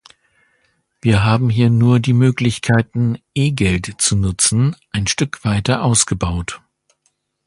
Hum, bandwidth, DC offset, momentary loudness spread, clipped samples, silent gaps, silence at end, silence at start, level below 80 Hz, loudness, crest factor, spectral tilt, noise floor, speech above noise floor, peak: none; 11.5 kHz; under 0.1%; 7 LU; under 0.1%; none; 0.9 s; 1.05 s; -36 dBFS; -16 LUFS; 16 dB; -5 dB/octave; -66 dBFS; 51 dB; 0 dBFS